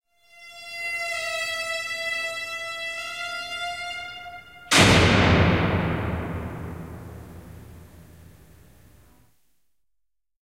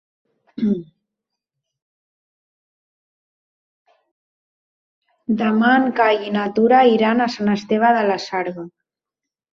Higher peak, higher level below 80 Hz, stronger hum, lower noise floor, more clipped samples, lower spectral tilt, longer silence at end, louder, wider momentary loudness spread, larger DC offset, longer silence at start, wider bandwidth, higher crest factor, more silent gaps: about the same, -4 dBFS vs -2 dBFS; first, -42 dBFS vs -64 dBFS; neither; second, -79 dBFS vs -86 dBFS; neither; second, -4 dB/octave vs -6.5 dB/octave; first, 2.3 s vs 0.85 s; second, -23 LUFS vs -18 LUFS; first, 24 LU vs 14 LU; first, 0.1% vs under 0.1%; second, 0.35 s vs 0.6 s; first, 16 kHz vs 7.2 kHz; about the same, 22 dB vs 18 dB; second, none vs 1.82-3.85 s, 4.11-5.02 s